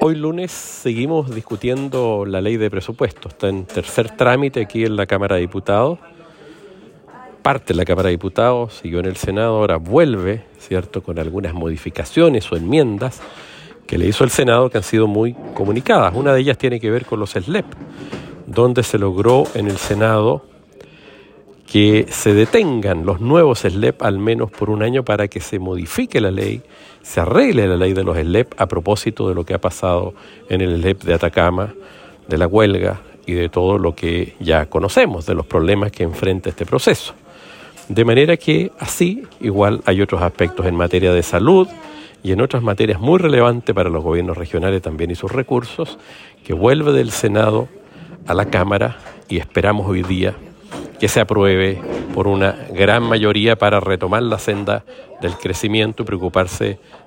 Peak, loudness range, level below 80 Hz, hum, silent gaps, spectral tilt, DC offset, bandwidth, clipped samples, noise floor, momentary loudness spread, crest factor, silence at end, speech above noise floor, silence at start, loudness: 0 dBFS; 4 LU; -42 dBFS; none; none; -6 dB/octave; under 0.1%; 16.5 kHz; under 0.1%; -44 dBFS; 11 LU; 16 dB; 0.1 s; 28 dB; 0 s; -17 LUFS